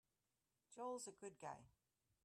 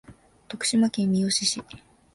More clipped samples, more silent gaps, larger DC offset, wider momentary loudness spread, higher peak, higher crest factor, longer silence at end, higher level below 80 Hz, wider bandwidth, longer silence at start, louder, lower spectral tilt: neither; neither; neither; about the same, 10 LU vs 10 LU; second, -40 dBFS vs -12 dBFS; about the same, 18 dB vs 16 dB; first, 0.55 s vs 0.35 s; second, -88 dBFS vs -60 dBFS; first, 13 kHz vs 11.5 kHz; first, 0.7 s vs 0.1 s; second, -54 LUFS vs -24 LUFS; about the same, -3.5 dB/octave vs -3.5 dB/octave